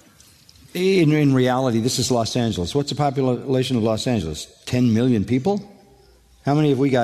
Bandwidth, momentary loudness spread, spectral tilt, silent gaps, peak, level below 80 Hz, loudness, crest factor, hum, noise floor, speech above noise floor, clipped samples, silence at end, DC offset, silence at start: 13.5 kHz; 8 LU; -6 dB/octave; none; -6 dBFS; -48 dBFS; -20 LUFS; 14 dB; none; -52 dBFS; 33 dB; under 0.1%; 0 s; under 0.1%; 0.75 s